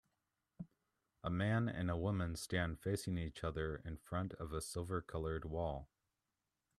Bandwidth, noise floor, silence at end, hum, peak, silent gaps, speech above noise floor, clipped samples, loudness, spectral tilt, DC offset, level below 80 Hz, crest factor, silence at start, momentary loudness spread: 13.5 kHz; -90 dBFS; 0.95 s; none; -22 dBFS; none; 49 dB; under 0.1%; -42 LUFS; -6 dB/octave; under 0.1%; -58 dBFS; 20 dB; 0.6 s; 11 LU